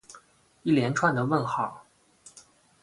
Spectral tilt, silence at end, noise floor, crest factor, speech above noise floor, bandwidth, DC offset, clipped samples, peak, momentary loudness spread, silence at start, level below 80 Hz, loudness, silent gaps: -6 dB/octave; 0.45 s; -56 dBFS; 20 dB; 31 dB; 11.5 kHz; under 0.1%; under 0.1%; -8 dBFS; 10 LU; 0.1 s; -64 dBFS; -26 LUFS; none